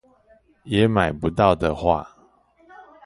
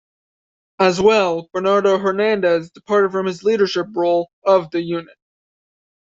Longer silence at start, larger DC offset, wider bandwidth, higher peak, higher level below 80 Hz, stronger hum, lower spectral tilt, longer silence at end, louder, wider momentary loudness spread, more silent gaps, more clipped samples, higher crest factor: second, 0.65 s vs 0.8 s; neither; first, 11.5 kHz vs 7.8 kHz; about the same, -2 dBFS vs -2 dBFS; first, -42 dBFS vs -60 dBFS; neither; first, -7.5 dB/octave vs -5.5 dB/octave; second, 0.25 s vs 1.05 s; second, -21 LUFS vs -18 LUFS; about the same, 5 LU vs 7 LU; second, none vs 4.33-4.42 s; neither; first, 22 dB vs 16 dB